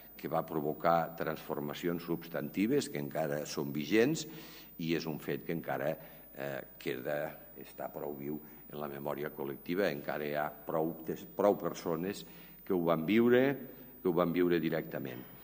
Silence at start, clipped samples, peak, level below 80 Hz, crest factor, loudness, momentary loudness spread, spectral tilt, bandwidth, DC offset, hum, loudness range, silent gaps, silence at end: 0 s; under 0.1%; -14 dBFS; -68 dBFS; 20 dB; -35 LUFS; 14 LU; -6 dB/octave; 16 kHz; under 0.1%; none; 8 LU; none; 0 s